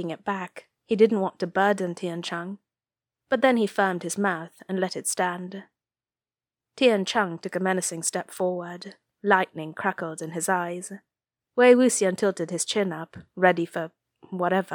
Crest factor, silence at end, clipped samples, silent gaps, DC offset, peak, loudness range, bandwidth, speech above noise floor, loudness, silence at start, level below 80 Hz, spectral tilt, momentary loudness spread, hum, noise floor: 22 dB; 0 s; under 0.1%; none; under 0.1%; -4 dBFS; 4 LU; 19 kHz; over 65 dB; -25 LUFS; 0 s; -76 dBFS; -4 dB/octave; 16 LU; none; under -90 dBFS